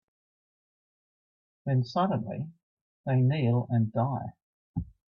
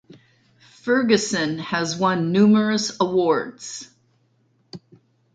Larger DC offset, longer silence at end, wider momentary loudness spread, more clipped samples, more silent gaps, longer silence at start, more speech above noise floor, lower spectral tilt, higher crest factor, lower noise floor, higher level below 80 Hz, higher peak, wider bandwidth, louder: neither; second, 0.2 s vs 0.55 s; second, 14 LU vs 17 LU; neither; first, 2.63-3.04 s, 4.42-4.74 s vs none; first, 1.65 s vs 0.85 s; first, over 63 dB vs 44 dB; first, -9.5 dB/octave vs -5 dB/octave; about the same, 16 dB vs 20 dB; first, under -90 dBFS vs -64 dBFS; first, -56 dBFS vs -64 dBFS; second, -14 dBFS vs -2 dBFS; second, 6 kHz vs 9.2 kHz; second, -29 LUFS vs -20 LUFS